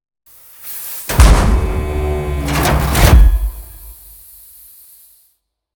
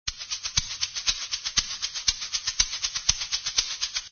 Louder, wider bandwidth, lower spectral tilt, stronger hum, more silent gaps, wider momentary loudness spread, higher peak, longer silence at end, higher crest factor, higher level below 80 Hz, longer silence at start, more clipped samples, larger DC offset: first, -14 LUFS vs -26 LUFS; first, over 20 kHz vs 7 kHz; first, -5 dB/octave vs 1.5 dB/octave; neither; neither; first, 26 LU vs 5 LU; first, 0 dBFS vs -4 dBFS; first, 1.8 s vs 0.05 s; second, 14 dB vs 26 dB; first, -16 dBFS vs -46 dBFS; first, 0.65 s vs 0.05 s; first, 0.2% vs under 0.1%; neither